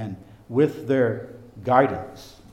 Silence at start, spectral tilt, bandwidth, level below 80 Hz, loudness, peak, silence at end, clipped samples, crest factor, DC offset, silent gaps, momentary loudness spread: 0 s; -8 dB/octave; 15.5 kHz; -58 dBFS; -22 LUFS; -2 dBFS; 0.2 s; under 0.1%; 22 dB; under 0.1%; none; 20 LU